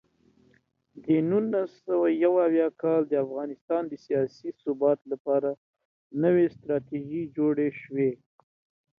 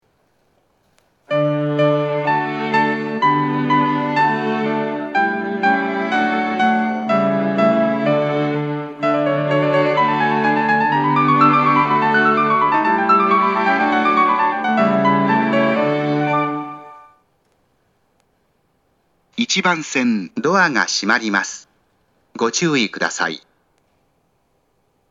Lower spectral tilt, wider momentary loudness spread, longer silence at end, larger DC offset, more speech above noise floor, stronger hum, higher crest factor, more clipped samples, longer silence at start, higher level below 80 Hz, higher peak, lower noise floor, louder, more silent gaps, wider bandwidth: first, -10 dB/octave vs -5 dB/octave; first, 10 LU vs 6 LU; second, 0.85 s vs 1.75 s; neither; second, 40 dB vs 46 dB; neither; about the same, 16 dB vs 18 dB; neither; second, 0.95 s vs 1.3 s; about the same, -72 dBFS vs -72 dBFS; second, -12 dBFS vs 0 dBFS; about the same, -66 dBFS vs -64 dBFS; second, -27 LUFS vs -17 LUFS; first, 3.61-3.68 s, 5.20-5.25 s, 5.57-5.74 s, 5.85-6.10 s vs none; second, 6 kHz vs 8 kHz